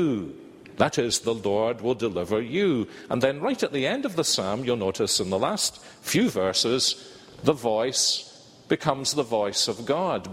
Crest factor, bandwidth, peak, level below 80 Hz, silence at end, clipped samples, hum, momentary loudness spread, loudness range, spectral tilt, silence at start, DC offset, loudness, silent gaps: 22 dB; 16 kHz; -4 dBFS; -60 dBFS; 0 s; under 0.1%; none; 7 LU; 1 LU; -3.5 dB/octave; 0 s; under 0.1%; -25 LUFS; none